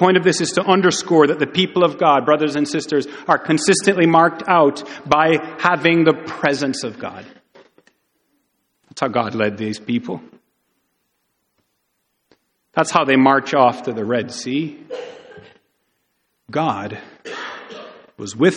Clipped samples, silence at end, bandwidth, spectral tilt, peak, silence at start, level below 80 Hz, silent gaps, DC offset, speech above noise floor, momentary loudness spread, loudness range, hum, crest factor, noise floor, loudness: under 0.1%; 0 s; 11 kHz; -4.5 dB/octave; 0 dBFS; 0 s; -62 dBFS; none; under 0.1%; 54 dB; 18 LU; 12 LU; none; 18 dB; -71 dBFS; -17 LUFS